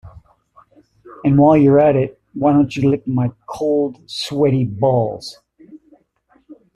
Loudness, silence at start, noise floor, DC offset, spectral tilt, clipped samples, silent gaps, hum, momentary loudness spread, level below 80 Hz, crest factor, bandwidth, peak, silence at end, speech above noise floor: -16 LUFS; 0.05 s; -58 dBFS; under 0.1%; -8 dB/octave; under 0.1%; none; none; 13 LU; -48 dBFS; 14 dB; 11 kHz; -2 dBFS; 0.25 s; 43 dB